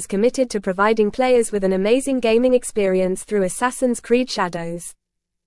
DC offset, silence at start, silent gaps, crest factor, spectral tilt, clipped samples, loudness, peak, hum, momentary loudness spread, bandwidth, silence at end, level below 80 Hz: under 0.1%; 0 s; none; 14 dB; -4.5 dB/octave; under 0.1%; -19 LUFS; -4 dBFS; none; 6 LU; 12 kHz; 0.55 s; -48 dBFS